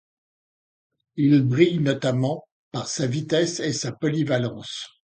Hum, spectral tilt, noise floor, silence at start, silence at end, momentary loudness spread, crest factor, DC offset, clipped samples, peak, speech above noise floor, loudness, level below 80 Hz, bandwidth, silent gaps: none; -5.5 dB/octave; under -90 dBFS; 1.15 s; 0.2 s; 14 LU; 20 dB; under 0.1%; under 0.1%; -4 dBFS; over 68 dB; -23 LUFS; -64 dBFS; 9.4 kHz; 2.52-2.71 s